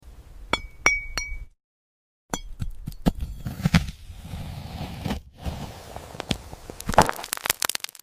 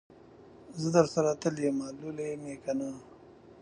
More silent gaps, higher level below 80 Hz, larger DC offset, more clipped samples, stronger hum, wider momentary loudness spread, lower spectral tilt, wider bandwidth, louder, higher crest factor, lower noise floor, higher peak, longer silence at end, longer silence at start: first, 1.64-2.29 s vs none; first, -38 dBFS vs -68 dBFS; neither; neither; neither; about the same, 16 LU vs 14 LU; second, -4 dB/octave vs -6 dB/octave; first, 16 kHz vs 11 kHz; first, -27 LUFS vs -31 LUFS; about the same, 28 dB vs 24 dB; first, under -90 dBFS vs -54 dBFS; first, 0 dBFS vs -8 dBFS; first, 0.25 s vs 0 s; about the same, 0.05 s vs 0.1 s